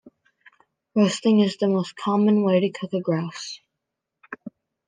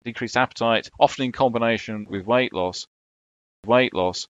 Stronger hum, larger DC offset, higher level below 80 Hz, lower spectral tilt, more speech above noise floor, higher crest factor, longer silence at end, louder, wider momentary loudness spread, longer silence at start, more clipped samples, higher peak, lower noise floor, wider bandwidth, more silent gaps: neither; neither; second, -74 dBFS vs -58 dBFS; first, -6.5 dB/octave vs -4.5 dB/octave; second, 62 dB vs over 68 dB; second, 16 dB vs 22 dB; first, 0.4 s vs 0.05 s; about the same, -22 LUFS vs -22 LUFS; first, 20 LU vs 11 LU; first, 0.95 s vs 0.05 s; neither; second, -8 dBFS vs -2 dBFS; second, -83 dBFS vs under -90 dBFS; first, 9.6 kHz vs 8.2 kHz; second, none vs 2.87-3.63 s